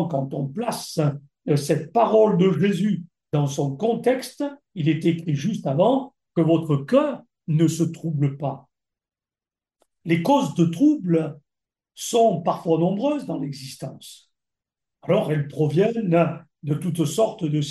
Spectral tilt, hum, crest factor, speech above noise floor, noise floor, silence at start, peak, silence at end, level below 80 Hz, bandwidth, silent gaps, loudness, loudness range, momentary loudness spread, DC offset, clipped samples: -7 dB/octave; none; 16 dB; over 69 dB; under -90 dBFS; 0 s; -6 dBFS; 0 s; -68 dBFS; 12.5 kHz; none; -22 LUFS; 4 LU; 12 LU; under 0.1%; under 0.1%